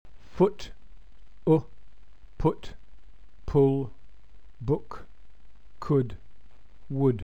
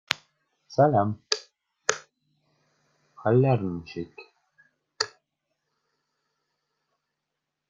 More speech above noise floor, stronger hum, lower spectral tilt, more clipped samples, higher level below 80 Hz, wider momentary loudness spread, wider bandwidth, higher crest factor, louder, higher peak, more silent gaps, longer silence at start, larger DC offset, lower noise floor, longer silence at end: second, 28 dB vs 60 dB; neither; first, -9.5 dB/octave vs -5 dB/octave; neither; first, -46 dBFS vs -68 dBFS; first, 22 LU vs 16 LU; second, 8.2 kHz vs 9.6 kHz; second, 20 dB vs 30 dB; about the same, -27 LUFS vs -26 LUFS; second, -10 dBFS vs 0 dBFS; neither; about the same, 0.2 s vs 0.1 s; first, 1% vs under 0.1%; second, -53 dBFS vs -84 dBFS; second, 0.1 s vs 2.6 s